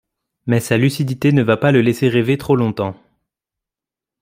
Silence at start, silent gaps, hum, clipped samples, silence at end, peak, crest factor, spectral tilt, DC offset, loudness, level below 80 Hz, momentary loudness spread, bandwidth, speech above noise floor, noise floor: 0.45 s; none; none; under 0.1%; 1.3 s; -2 dBFS; 16 dB; -7 dB/octave; under 0.1%; -16 LUFS; -52 dBFS; 8 LU; 16 kHz; 72 dB; -88 dBFS